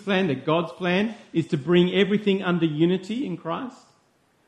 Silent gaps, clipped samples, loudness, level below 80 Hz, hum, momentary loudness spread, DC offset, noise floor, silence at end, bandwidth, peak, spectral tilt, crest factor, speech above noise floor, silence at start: none; under 0.1%; -24 LUFS; -64 dBFS; none; 10 LU; under 0.1%; -64 dBFS; 0.7 s; 9 kHz; -6 dBFS; -7.5 dB/octave; 16 dB; 41 dB; 0 s